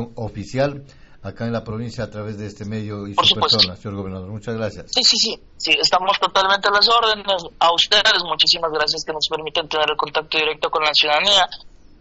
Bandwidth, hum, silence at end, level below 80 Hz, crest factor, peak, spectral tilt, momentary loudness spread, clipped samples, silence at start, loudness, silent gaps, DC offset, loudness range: 8 kHz; none; 0.3 s; -48 dBFS; 18 dB; -2 dBFS; -0.5 dB/octave; 16 LU; under 0.1%; 0 s; -17 LUFS; none; under 0.1%; 5 LU